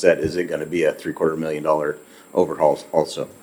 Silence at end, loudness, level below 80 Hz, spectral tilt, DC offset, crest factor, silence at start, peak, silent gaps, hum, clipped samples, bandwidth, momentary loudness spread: 0.1 s; -22 LUFS; -54 dBFS; -5.5 dB/octave; under 0.1%; 20 dB; 0 s; 0 dBFS; none; none; under 0.1%; 19 kHz; 7 LU